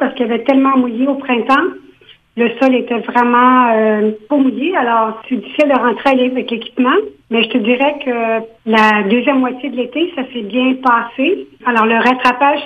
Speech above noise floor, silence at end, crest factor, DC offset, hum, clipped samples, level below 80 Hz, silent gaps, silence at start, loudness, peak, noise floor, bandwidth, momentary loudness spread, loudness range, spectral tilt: 31 dB; 0 s; 14 dB; under 0.1%; none; under 0.1%; -58 dBFS; none; 0 s; -14 LUFS; 0 dBFS; -45 dBFS; 7.4 kHz; 8 LU; 2 LU; -6 dB/octave